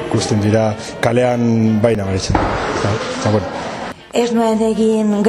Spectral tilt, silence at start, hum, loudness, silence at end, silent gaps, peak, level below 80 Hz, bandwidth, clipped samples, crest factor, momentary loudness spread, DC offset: -6 dB/octave; 0 s; none; -16 LUFS; 0 s; none; 0 dBFS; -36 dBFS; 12.5 kHz; under 0.1%; 16 dB; 6 LU; under 0.1%